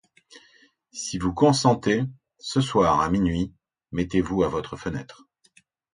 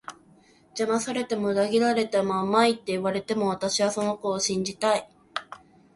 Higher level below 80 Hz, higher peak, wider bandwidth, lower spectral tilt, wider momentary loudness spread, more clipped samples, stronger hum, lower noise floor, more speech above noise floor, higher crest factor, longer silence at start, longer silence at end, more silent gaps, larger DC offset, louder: first, -46 dBFS vs -66 dBFS; about the same, -4 dBFS vs -6 dBFS; about the same, 10.5 kHz vs 11.5 kHz; first, -5.5 dB/octave vs -4 dB/octave; about the same, 13 LU vs 14 LU; neither; neither; first, -61 dBFS vs -57 dBFS; first, 38 dB vs 32 dB; about the same, 22 dB vs 20 dB; first, 0.35 s vs 0.1 s; first, 0.8 s vs 0.4 s; neither; neither; about the same, -24 LUFS vs -25 LUFS